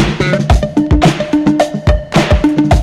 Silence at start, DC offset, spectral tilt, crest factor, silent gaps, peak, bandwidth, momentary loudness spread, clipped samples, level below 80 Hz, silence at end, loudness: 0 s; under 0.1%; -6.5 dB/octave; 10 dB; none; 0 dBFS; 13 kHz; 2 LU; under 0.1%; -18 dBFS; 0 s; -12 LUFS